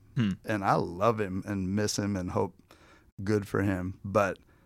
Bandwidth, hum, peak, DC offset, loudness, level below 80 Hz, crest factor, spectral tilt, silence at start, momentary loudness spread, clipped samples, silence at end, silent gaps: 16 kHz; none; -10 dBFS; under 0.1%; -30 LUFS; -58 dBFS; 20 dB; -6 dB/octave; 0.15 s; 5 LU; under 0.1%; 0.3 s; 3.12-3.17 s